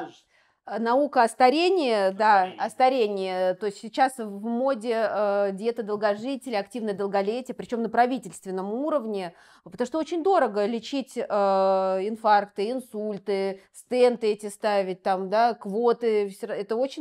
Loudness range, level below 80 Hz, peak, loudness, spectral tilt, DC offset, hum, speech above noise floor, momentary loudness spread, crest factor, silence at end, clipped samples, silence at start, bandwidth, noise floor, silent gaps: 5 LU; -76 dBFS; -6 dBFS; -25 LUFS; -5 dB/octave; under 0.1%; none; 39 dB; 10 LU; 18 dB; 0 s; under 0.1%; 0 s; 14 kHz; -63 dBFS; none